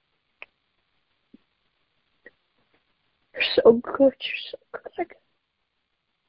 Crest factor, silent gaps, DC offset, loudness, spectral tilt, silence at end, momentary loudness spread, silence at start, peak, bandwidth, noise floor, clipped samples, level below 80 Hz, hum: 24 dB; none; under 0.1%; -22 LUFS; -2 dB/octave; 1.25 s; 20 LU; 3.35 s; -4 dBFS; 5.6 kHz; -76 dBFS; under 0.1%; -64 dBFS; none